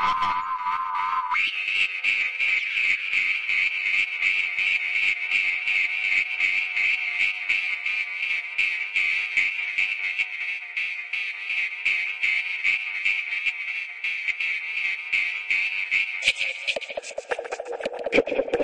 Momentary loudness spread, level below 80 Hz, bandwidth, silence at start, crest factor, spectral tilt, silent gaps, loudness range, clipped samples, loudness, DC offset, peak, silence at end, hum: 6 LU; -64 dBFS; 11 kHz; 0 s; 18 dB; -1 dB/octave; none; 3 LU; under 0.1%; -23 LUFS; under 0.1%; -8 dBFS; 0 s; none